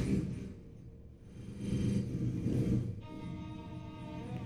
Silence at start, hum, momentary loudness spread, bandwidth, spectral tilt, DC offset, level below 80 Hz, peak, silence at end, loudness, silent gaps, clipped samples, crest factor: 0 s; none; 19 LU; 10 kHz; -8 dB/octave; under 0.1%; -50 dBFS; -22 dBFS; 0 s; -38 LUFS; none; under 0.1%; 16 dB